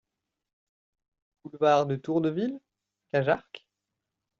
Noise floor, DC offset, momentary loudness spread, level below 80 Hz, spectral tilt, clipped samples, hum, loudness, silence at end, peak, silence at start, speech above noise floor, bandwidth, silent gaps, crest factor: -86 dBFS; under 0.1%; 24 LU; -72 dBFS; -5.5 dB/octave; under 0.1%; none; -27 LUFS; 0.8 s; -10 dBFS; 1.45 s; 60 dB; 7.2 kHz; none; 20 dB